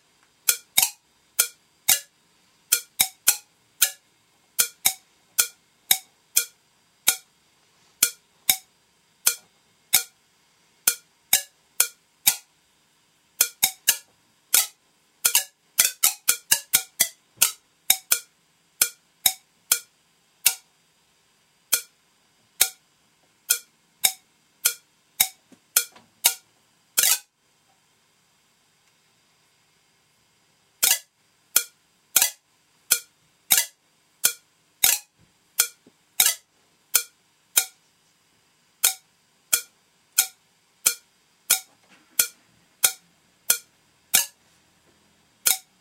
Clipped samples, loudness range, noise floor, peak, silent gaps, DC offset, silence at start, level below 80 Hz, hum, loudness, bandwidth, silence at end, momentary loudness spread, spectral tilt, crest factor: under 0.1%; 5 LU; -65 dBFS; 0 dBFS; none; under 0.1%; 0.45 s; -70 dBFS; none; -22 LUFS; 16.5 kHz; 0.2 s; 10 LU; 3 dB/octave; 28 dB